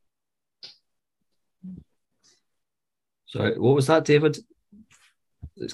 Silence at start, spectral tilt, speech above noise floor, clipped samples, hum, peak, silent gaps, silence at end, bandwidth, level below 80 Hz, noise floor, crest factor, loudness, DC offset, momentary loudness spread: 0.65 s; -6 dB/octave; 69 dB; under 0.1%; none; -6 dBFS; none; 0 s; 12.5 kHz; -58 dBFS; -89 dBFS; 22 dB; -21 LUFS; under 0.1%; 26 LU